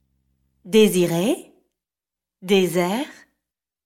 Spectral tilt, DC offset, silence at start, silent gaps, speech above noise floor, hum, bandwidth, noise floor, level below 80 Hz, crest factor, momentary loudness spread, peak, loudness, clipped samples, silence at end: -5 dB/octave; under 0.1%; 0.65 s; none; 71 dB; none; 16.5 kHz; -89 dBFS; -62 dBFS; 18 dB; 13 LU; -4 dBFS; -20 LUFS; under 0.1%; 0.75 s